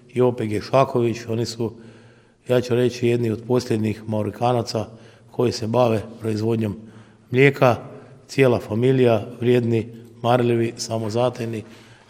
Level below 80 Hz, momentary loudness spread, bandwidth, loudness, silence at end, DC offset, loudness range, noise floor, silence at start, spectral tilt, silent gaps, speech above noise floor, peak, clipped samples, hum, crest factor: -60 dBFS; 11 LU; 15.5 kHz; -21 LUFS; 0.35 s; under 0.1%; 4 LU; -51 dBFS; 0.15 s; -6.5 dB/octave; none; 30 dB; 0 dBFS; under 0.1%; none; 20 dB